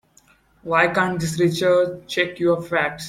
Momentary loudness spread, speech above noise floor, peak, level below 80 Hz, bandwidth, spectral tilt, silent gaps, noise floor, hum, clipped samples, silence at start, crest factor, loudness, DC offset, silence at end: 6 LU; 37 dB; -2 dBFS; -56 dBFS; 16 kHz; -5 dB/octave; none; -57 dBFS; none; under 0.1%; 0.65 s; 18 dB; -20 LUFS; under 0.1%; 0 s